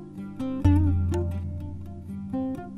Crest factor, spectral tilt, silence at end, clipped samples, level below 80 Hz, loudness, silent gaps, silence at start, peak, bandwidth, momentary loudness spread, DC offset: 18 dB; -9 dB/octave; 0 s; under 0.1%; -36 dBFS; -27 LUFS; none; 0 s; -8 dBFS; 7.2 kHz; 16 LU; under 0.1%